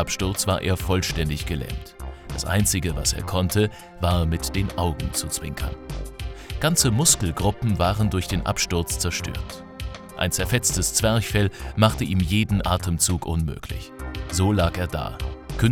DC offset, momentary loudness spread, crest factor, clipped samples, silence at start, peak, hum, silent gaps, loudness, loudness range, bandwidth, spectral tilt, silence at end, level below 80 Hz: under 0.1%; 14 LU; 22 dB; under 0.1%; 0 s; -2 dBFS; none; none; -23 LUFS; 3 LU; 18.5 kHz; -4 dB/octave; 0 s; -34 dBFS